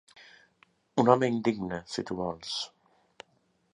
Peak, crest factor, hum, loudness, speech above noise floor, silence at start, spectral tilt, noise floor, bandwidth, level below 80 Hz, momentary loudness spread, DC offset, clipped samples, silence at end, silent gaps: -6 dBFS; 26 dB; none; -29 LUFS; 42 dB; 0.2 s; -5.5 dB/octave; -71 dBFS; 11 kHz; -64 dBFS; 12 LU; under 0.1%; under 0.1%; 1.05 s; none